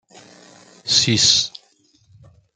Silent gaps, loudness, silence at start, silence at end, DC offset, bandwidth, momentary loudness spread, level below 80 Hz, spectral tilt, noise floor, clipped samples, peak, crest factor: none; -15 LUFS; 0.85 s; 1.05 s; under 0.1%; 12 kHz; 15 LU; -58 dBFS; -1.5 dB/octave; -58 dBFS; under 0.1%; 0 dBFS; 22 dB